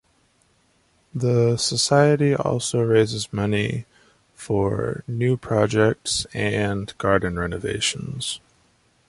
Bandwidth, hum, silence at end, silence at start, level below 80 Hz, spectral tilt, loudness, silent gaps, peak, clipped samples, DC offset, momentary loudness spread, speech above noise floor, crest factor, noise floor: 11.5 kHz; none; 0.7 s; 1.15 s; -48 dBFS; -5 dB/octave; -22 LUFS; none; -4 dBFS; under 0.1%; under 0.1%; 10 LU; 41 dB; 18 dB; -63 dBFS